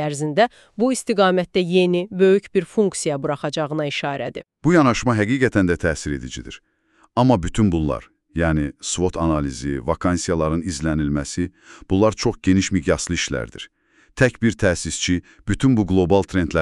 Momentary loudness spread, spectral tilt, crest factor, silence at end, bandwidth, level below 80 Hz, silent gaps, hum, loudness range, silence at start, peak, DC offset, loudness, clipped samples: 10 LU; -5.5 dB/octave; 18 dB; 0 s; 12 kHz; -38 dBFS; none; none; 3 LU; 0 s; -2 dBFS; under 0.1%; -20 LUFS; under 0.1%